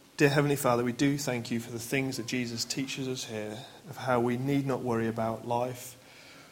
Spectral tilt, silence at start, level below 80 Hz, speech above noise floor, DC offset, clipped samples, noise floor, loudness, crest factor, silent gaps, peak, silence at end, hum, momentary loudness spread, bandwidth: -5 dB/octave; 0.2 s; -66 dBFS; 22 dB; under 0.1%; under 0.1%; -52 dBFS; -30 LUFS; 22 dB; none; -8 dBFS; 0 s; none; 16 LU; 16.5 kHz